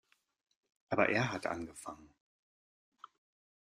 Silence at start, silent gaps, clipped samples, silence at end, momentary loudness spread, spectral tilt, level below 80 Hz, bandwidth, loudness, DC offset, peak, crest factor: 0.9 s; none; under 0.1%; 1.55 s; 18 LU; -5.5 dB/octave; -72 dBFS; 14.5 kHz; -35 LUFS; under 0.1%; -12 dBFS; 28 dB